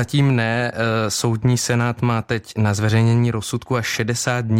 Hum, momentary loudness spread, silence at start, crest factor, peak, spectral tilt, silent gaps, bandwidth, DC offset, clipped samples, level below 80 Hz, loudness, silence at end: none; 5 LU; 0 s; 12 dB; -6 dBFS; -5.5 dB/octave; none; 16 kHz; under 0.1%; under 0.1%; -50 dBFS; -19 LUFS; 0 s